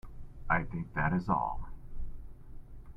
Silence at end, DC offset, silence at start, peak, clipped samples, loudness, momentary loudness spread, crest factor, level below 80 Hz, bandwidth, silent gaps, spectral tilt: 0.05 s; under 0.1%; 0.05 s; -14 dBFS; under 0.1%; -33 LUFS; 23 LU; 22 dB; -44 dBFS; 5.6 kHz; none; -9.5 dB/octave